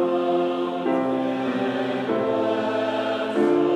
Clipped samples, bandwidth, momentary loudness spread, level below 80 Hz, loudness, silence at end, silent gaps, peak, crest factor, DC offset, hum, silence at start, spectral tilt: under 0.1%; 9.8 kHz; 3 LU; -68 dBFS; -23 LUFS; 0 s; none; -10 dBFS; 14 dB; under 0.1%; none; 0 s; -6.5 dB/octave